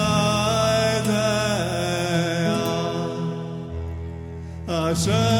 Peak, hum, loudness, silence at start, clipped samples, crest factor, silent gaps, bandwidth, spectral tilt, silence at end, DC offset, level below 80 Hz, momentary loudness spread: -8 dBFS; none; -23 LUFS; 0 s; under 0.1%; 14 dB; none; 17 kHz; -5 dB/octave; 0 s; under 0.1%; -42 dBFS; 13 LU